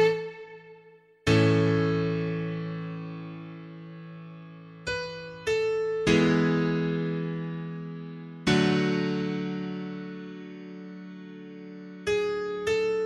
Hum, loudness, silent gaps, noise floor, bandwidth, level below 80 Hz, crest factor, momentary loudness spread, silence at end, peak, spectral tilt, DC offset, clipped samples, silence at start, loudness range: none; -28 LUFS; none; -55 dBFS; 11.5 kHz; -56 dBFS; 20 dB; 20 LU; 0 s; -8 dBFS; -6.5 dB/octave; under 0.1%; under 0.1%; 0 s; 8 LU